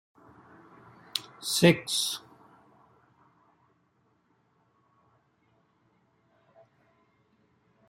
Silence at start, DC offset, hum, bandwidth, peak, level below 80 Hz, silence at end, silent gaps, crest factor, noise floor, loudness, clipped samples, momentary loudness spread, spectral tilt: 1.15 s; under 0.1%; none; 16 kHz; -6 dBFS; -72 dBFS; 5.7 s; none; 28 dB; -70 dBFS; -27 LUFS; under 0.1%; 14 LU; -4 dB/octave